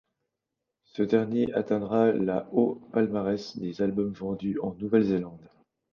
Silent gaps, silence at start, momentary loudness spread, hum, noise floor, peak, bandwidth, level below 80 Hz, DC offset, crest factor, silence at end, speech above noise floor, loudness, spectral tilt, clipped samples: none; 0.95 s; 8 LU; none; -85 dBFS; -10 dBFS; 7 kHz; -62 dBFS; under 0.1%; 18 dB; 0.5 s; 58 dB; -27 LUFS; -8.5 dB/octave; under 0.1%